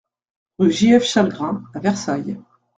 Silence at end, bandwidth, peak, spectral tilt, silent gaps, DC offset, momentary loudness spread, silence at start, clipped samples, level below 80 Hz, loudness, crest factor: 0.35 s; 9.2 kHz; -2 dBFS; -5 dB/octave; none; under 0.1%; 12 LU; 0.6 s; under 0.1%; -58 dBFS; -18 LUFS; 18 dB